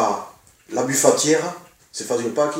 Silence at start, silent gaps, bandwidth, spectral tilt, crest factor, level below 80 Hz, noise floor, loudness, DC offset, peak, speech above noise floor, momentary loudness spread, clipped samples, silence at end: 0 s; none; 16 kHz; -3 dB/octave; 22 dB; -66 dBFS; -43 dBFS; -20 LUFS; under 0.1%; 0 dBFS; 24 dB; 19 LU; under 0.1%; 0 s